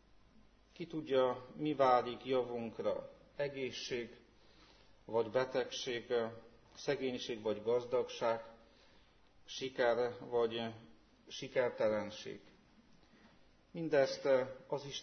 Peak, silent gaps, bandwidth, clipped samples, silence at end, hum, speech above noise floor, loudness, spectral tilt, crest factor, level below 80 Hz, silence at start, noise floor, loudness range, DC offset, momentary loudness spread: -18 dBFS; none; 6.4 kHz; under 0.1%; 0 s; none; 29 dB; -37 LUFS; -3 dB/octave; 20 dB; -72 dBFS; 0.8 s; -65 dBFS; 4 LU; under 0.1%; 15 LU